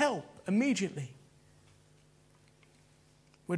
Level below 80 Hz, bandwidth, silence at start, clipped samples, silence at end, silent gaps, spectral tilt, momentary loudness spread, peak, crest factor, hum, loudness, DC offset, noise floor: -76 dBFS; 11 kHz; 0 s; under 0.1%; 0 s; none; -5 dB/octave; 17 LU; -16 dBFS; 20 dB; none; -33 LUFS; under 0.1%; -64 dBFS